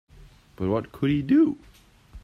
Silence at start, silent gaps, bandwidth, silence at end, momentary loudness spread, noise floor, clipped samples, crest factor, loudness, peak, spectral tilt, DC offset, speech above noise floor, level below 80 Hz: 0.6 s; none; 6.4 kHz; 0.05 s; 10 LU; -51 dBFS; under 0.1%; 16 dB; -24 LUFS; -10 dBFS; -9 dB/octave; under 0.1%; 28 dB; -50 dBFS